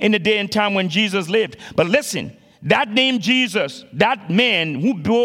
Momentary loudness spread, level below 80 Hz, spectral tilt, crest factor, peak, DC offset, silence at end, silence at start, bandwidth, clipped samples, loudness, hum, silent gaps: 8 LU; -58 dBFS; -4.5 dB/octave; 18 dB; 0 dBFS; under 0.1%; 0 s; 0 s; 16 kHz; under 0.1%; -18 LUFS; none; none